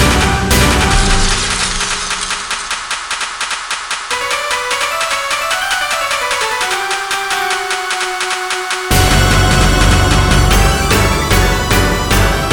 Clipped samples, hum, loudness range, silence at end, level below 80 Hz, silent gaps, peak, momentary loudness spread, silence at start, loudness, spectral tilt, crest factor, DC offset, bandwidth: under 0.1%; none; 5 LU; 0 s; -20 dBFS; none; 0 dBFS; 7 LU; 0 s; -13 LUFS; -3.5 dB/octave; 14 dB; under 0.1%; 19 kHz